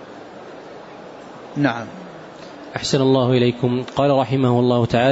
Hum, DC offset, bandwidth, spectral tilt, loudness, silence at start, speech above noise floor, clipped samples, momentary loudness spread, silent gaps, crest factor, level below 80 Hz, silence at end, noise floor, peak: none; under 0.1%; 8 kHz; -6.5 dB/octave; -18 LUFS; 0 s; 20 dB; under 0.1%; 21 LU; none; 16 dB; -52 dBFS; 0 s; -38 dBFS; -4 dBFS